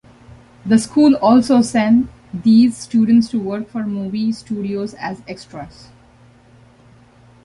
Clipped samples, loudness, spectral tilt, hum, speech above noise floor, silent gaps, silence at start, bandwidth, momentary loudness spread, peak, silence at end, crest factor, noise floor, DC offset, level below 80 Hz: under 0.1%; -16 LUFS; -6 dB/octave; none; 32 dB; none; 0.65 s; 11.5 kHz; 19 LU; -2 dBFS; 1.75 s; 14 dB; -48 dBFS; under 0.1%; -50 dBFS